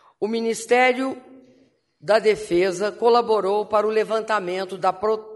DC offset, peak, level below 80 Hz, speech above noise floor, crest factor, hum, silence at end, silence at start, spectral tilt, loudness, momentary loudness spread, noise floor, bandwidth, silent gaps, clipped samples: under 0.1%; -4 dBFS; -62 dBFS; 38 dB; 18 dB; none; 0 s; 0.2 s; -4 dB/octave; -21 LUFS; 9 LU; -59 dBFS; 11.5 kHz; none; under 0.1%